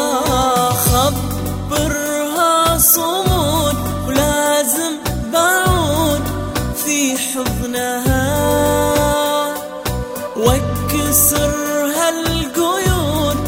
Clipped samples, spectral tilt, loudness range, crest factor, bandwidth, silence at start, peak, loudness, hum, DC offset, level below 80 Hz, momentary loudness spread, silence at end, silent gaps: under 0.1%; -4 dB/octave; 2 LU; 16 dB; 16.5 kHz; 0 s; 0 dBFS; -16 LUFS; none; under 0.1%; -28 dBFS; 9 LU; 0 s; none